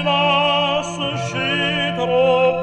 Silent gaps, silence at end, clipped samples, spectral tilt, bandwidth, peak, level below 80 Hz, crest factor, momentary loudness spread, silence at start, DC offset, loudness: none; 0 s; under 0.1%; -4.5 dB/octave; 9.6 kHz; -4 dBFS; -50 dBFS; 14 dB; 7 LU; 0 s; under 0.1%; -18 LUFS